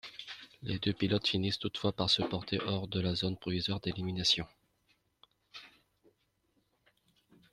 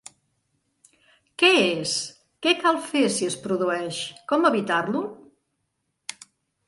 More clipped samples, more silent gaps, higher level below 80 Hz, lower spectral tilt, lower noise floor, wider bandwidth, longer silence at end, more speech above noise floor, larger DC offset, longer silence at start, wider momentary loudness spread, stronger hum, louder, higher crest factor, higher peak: neither; neither; first, -62 dBFS vs -72 dBFS; first, -5 dB/octave vs -3 dB/octave; about the same, -76 dBFS vs -76 dBFS; first, 13 kHz vs 11.5 kHz; first, 1.85 s vs 0.55 s; second, 43 dB vs 54 dB; neither; second, 0.05 s vs 1.4 s; about the same, 18 LU vs 19 LU; neither; second, -33 LUFS vs -23 LUFS; about the same, 20 dB vs 22 dB; second, -16 dBFS vs -4 dBFS